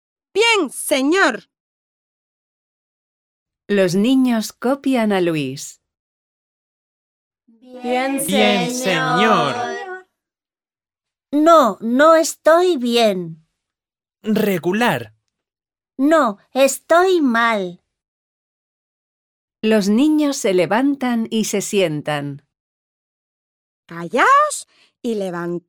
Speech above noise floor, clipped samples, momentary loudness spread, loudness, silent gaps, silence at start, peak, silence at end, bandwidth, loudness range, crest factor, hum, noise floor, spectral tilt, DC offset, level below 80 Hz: over 74 dB; under 0.1%; 14 LU; -17 LUFS; 1.60-3.46 s, 5.99-7.31 s, 18.08-19.48 s, 22.60-23.83 s; 0.35 s; 0 dBFS; 0.1 s; 19 kHz; 7 LU; 18 dB; none; under -90 dBFS; -4 dB/octave; under 0.1%; -66 dBFS